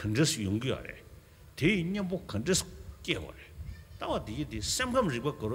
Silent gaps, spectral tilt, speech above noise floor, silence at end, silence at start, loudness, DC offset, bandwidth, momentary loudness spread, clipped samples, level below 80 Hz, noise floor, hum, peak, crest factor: none; -4.5 dB/octave; 22 dB; 0 s; 0 s; -31 LUFS; under 0.1%; 16.5 kHz; 18 LU; under 0.1%; -50 dBFS; -53 dBFS; none; -14 dBFS; 20 dB